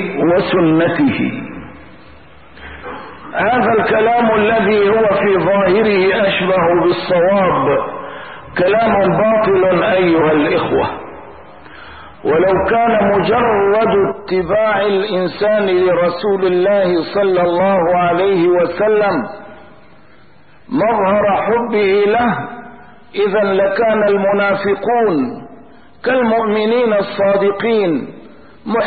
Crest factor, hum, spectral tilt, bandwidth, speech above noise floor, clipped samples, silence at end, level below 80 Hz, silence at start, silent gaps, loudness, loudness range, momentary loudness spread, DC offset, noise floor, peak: 10 dB; none; -11.5 dB/octave; 4.8 kHz; 34 dB; under 0.1%; 0 s; -46 dBFS; 0 s; none; -14 LUFS; 4 LU; 12 LU; 0.8%; -47 dBFS; -4 dBFS